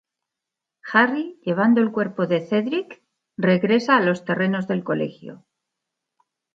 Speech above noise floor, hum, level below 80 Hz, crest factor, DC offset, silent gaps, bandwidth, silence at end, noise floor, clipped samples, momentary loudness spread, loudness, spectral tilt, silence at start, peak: 65 dB; none; -72 dBFS; 20 dB; under 0.1%; none; 7.6 kHz; 1.2 s; -85 dBFS; under 0.1%; 16 LU; -21 LUFS; -7 dB/octave; 0.85 s; -4 dBFS